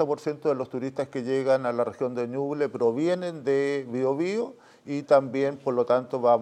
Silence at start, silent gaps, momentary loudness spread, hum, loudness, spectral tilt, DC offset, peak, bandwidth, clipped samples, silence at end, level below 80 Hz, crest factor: 0 s; none; 9 LU; none; -26 LUFS; -7 dB/octave; under 0.1%; -6 dBFS; 10 kHz; under 0.1%; 0 s; -78 dBFS; 20 dB